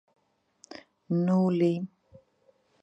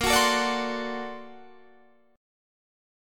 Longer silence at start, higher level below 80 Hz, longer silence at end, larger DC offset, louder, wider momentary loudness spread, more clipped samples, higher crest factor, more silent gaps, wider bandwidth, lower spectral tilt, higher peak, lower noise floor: first, 0.7 s vs 0 s; second, -76 dBFS vs -50 dBFS; about the same, 0.95 s vs 0.95 s; neither; about the same, -27 LUFS vs -25 LUFS; about the same, 23 LU vs 22 LU; neither; second, 16 dB vs 22 dB; neither; second, 8 kHz vs 17.5 kHz; first, -9 dB/octave vs -2 dB/octave; second, -14 dBFS vs -8 dBFS; first, -67 dBFS vs -59 dBFS